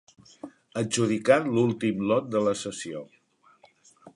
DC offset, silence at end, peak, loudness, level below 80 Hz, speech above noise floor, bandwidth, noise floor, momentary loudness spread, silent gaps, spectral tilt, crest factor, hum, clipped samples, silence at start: under 0.1%; 0.05 s; -6 dBFS; -26 LUFS; -68 dBFS; 35 dB; 11.5 kHz; -60 dBFS; 19 LU; none; -5 dB/octave; 22 dB; none; under 0.1%; 0.45 s